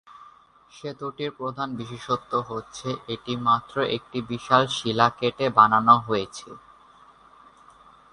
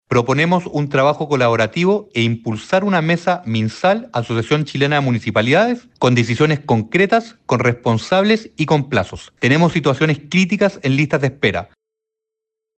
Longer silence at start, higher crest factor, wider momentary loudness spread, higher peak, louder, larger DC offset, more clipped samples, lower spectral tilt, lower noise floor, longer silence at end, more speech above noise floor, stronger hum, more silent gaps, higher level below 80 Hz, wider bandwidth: about the same, 0.2 s vs 0.1 s; first, 24 dB vs 14 dB; first, 16 LU vs 5 LU; about the same, -2 dBFS vs -4 dBFS; second, -23 LUFS vs -17 LUFS; neither; neither; second, -5 dB/octave vs -6.5 dB/octave; second, -53 dBFS vs -83 dBFS; first, 1.55 s vs 1.15 s; second, 29 dB vs 67 dB; neither; neither; second, -60 dBFS vs -52 dBFS; first, 11 kHz vs 8.8 kHz